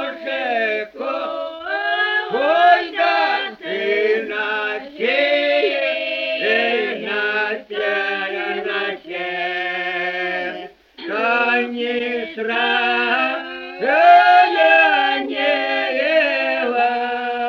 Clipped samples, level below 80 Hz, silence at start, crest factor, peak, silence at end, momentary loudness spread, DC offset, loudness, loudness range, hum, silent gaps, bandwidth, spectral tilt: under 0.1%; -64 dBFS; 0 s; 18 dB; -2 dBFS; 0 s; 12 LU; under 0.1%; -18 LUFS; 7 LU; none; none; 6.6 kHz; -4 dB/octave